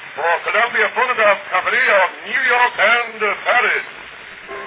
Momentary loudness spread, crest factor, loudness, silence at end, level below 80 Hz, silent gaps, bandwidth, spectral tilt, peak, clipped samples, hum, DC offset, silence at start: 16 LU; 16 dB; -15 LUFS; 0 s; -64 dBFS; none; 4 kHz; -4.5 dB/octave; -2 dBFS; under 0.1%; none; under 0.1%; 0 s